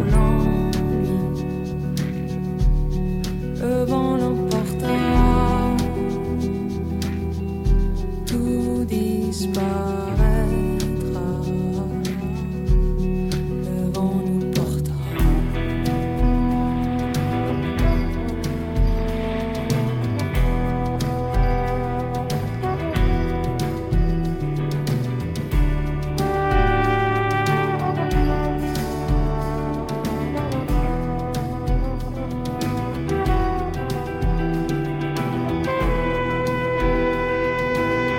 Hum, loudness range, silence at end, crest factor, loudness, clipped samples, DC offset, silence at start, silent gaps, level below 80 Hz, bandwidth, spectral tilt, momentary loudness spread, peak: none; 3 LU; 0 s; 16 dB; -23 LUFS; under 0.1%; under 0.1%; 0 s; none; -26 dBFS; 16.5 kHz; -7 dB/octave; 6 LU; -4 dBFS